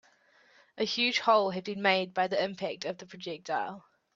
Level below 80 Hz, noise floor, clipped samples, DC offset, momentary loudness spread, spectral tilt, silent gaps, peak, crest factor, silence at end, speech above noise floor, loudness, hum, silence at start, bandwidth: -78 dBFS; -64 dBFS; under 0.1%; under 0.1%; 15 LU; -4 dB/octave; none; -8 dBFS; 22 dB; 0.35 s; 34 dB; -30 LUFS; none; 0.75 s; 7.8 kHz